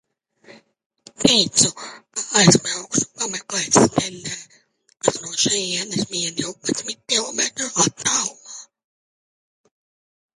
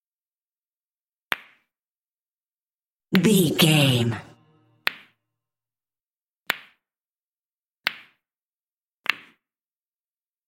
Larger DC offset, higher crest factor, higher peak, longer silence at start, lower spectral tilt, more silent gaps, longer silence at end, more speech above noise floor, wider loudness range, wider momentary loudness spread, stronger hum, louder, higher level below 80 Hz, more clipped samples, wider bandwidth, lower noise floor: neither; second, 22 dB vs 28 dB; about the same, 0 dBFS vs 0 dBFS; second, 0.5 s vs 1.3 s; second, -2.5 dB/octave vs -4.5 dB/octave; second, 0.86-0.90 s vs 1.79-2.46 s, 2.54-2.97 s, 6.03-6.20 s, 6.28-6.40 s, 7.01-7.74 s, 8.38-9.04 s; first, 1.7 s vs 1.3 s; second, 37 dB vs over 71 dB; second, 5 LU vs 13 LU; about the same, 15 LU vs 13 LU; neither; first, -19 LUFS vs -23 LUFS; first, -56 dBFS vs -68 dBFS; neither; second, 11.5 kHz vs 16.5 kHz; second, -58 dBFS vs under -90 dBFS